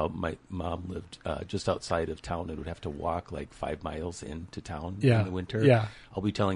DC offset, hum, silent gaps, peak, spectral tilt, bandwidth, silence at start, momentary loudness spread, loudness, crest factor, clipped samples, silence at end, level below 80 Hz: under 0.1%; none; none; -10 dBFS; -7 dB/octave; 11.5 kHz; 0 s; 13 LU; -31 LUFS; 22 dB; under 0.1%; 0 s; -46 dBFS